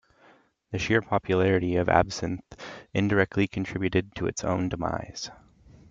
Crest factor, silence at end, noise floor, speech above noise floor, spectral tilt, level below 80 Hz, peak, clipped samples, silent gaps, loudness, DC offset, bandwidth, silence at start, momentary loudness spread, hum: 22 dB; 0.55 s; -59 dBFS; 34 dB; -6 dB/octave; -52 dBFS; -6 dBFS; under 0.1%; none; -27 LUFS; under 0.1%; 7.8 kHz; 0.7 s; 14 LU; none